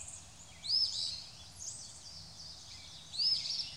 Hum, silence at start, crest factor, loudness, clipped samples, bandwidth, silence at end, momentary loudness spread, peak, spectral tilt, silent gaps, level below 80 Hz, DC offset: none; 0 s; 18 dB; -34 LUFS; under 0.1%; 16 kHz; 0 s; 18 LU; -20 dBFS; 0 dB/octave; none; -66 dBFS; under 0.1%